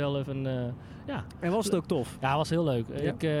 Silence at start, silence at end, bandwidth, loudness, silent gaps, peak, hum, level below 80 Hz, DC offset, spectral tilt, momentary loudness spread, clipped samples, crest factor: 0 s; 0 s; 15.5 kHz; -30 LUFS; none; -14 dBFS; none; -54 dBFS; under 0.1%; -6.5 dB/octave; 10 LU; under 0.1%; 16 dB